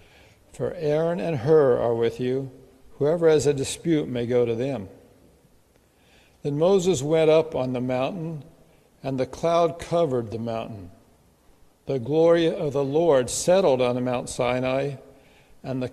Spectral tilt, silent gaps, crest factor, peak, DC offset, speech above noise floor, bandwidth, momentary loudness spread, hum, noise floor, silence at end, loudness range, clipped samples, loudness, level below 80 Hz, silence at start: -5.5 dB/octave; none; 16 dB; -6 dBFS; under 0.1%; 37 dB; 13 kHz; 14 LU; none; -59 dBFS; 0 s; 5 LU; under 0.1%; -23 LUFS; -56 dBFS; 0.55 s